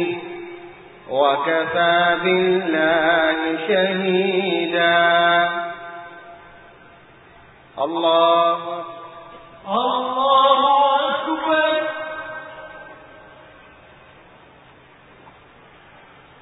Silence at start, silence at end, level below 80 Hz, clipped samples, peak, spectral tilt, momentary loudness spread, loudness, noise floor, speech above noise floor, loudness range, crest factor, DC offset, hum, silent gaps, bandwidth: 0 s; 3.2 s; -60 dBFS; under 0.1%; -4 dBFS; -9.5 dB/octave; 22 LU; -18 LUFS; -48 dBFS; 30 dB; 7 LU; 18 dB; under 0.1%; none; none; 4 kHz